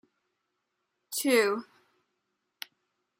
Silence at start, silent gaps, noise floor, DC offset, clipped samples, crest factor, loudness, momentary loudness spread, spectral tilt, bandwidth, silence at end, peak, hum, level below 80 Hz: 1.1 s; none; -81 dBFS; under 0.1%; under 0.1%; 22 dB; -28 LUFS; 21 LU; -2 dB/octave; 16 kHz; 1.55 s; -12 dBFS; none; -88 dBFS